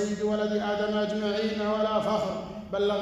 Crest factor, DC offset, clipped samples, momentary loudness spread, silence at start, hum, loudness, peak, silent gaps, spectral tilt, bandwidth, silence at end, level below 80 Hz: 12 dB; under 0.1%; under 0.1%; 4 LU; 0 s; none; -28 LUFS; -14 dBFS; none; -5.5 dB/octave; 11.5 kHz; 0 s; -56 dBFS